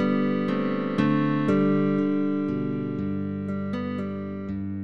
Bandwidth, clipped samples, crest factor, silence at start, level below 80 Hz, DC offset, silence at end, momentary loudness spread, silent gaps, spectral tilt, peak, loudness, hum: 6.4 kHz; under 0.1%; 14 dB; 0 s; -58 dBFS; 0.5%; 0 s; 9 LU; none; -9 dB/octave; -10 dBFS; -26 LUFS; none